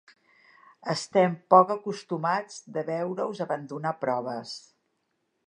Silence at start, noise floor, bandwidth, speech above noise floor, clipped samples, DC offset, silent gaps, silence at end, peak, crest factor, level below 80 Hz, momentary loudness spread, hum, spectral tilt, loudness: 0.85 s; -76 dBFS; 11 kHz; 50 dB; under 0.1%; under 0.1%; none; 0.9 s; -4 dBFS; 24 dB; -80 dBFS; 16 LU; none; -5.5 dB/octave; -27 LUFS